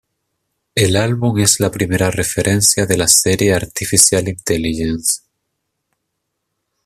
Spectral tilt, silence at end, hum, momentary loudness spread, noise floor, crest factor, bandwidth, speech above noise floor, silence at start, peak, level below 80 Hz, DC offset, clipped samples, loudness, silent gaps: -3.5 dB/octave; 1.7 s; none; 8 LU; -74 dBFS; 16 dB; 17.5 kHz; 59 dB; 0.75 s; 0 dBFS; -42 dBFS; under 0.1%; under 0.1%; -14 LUFS; none